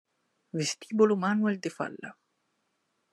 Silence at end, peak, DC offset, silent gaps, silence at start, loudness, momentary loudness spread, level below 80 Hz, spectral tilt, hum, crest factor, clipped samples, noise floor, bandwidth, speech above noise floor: 1 s; -10 dBFS; under 0.1%; none; 0.55 s; -29 LUFS; 15 LU; -84 dBFS; -5 dB/octave; none; 20 dB; under 0.1%; -77 dBFS; 12 kHz; 49 dB